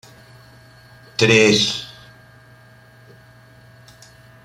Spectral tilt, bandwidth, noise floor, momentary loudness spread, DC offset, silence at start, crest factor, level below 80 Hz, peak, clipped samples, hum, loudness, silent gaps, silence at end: -3.5 dB/octave; 15.5 kHz; -47 dBFS; 17 LU; under 0.1%; 1.2 s; 22 dB; -56 dBFS; -2 dBFS; under 0.1%; none; -16 LUFS; none; 2.6 s